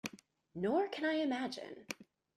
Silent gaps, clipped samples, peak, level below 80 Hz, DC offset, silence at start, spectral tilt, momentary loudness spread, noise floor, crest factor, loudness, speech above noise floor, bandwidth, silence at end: none; under 0.1%; -20 dBFS; -80 dBFS; under 0.1%; 0.05 s; -4.5 dB/octave; 13 LU; -58 dBFS; 18 dB; -38 LUFS; 21 dB; 15 kHz; 0.35 s